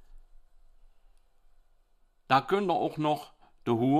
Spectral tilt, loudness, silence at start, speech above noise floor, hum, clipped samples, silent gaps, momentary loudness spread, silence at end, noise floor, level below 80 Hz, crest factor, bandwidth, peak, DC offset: -7 dB/octave; -29 LUFS; 0.15 s; 38 dB; none; under 0.1%; none; 8 LU; 0 s; -65 dBFS; -58 dBFS; 22 dB; 15 kHz; -10 dBFS; under 0.1%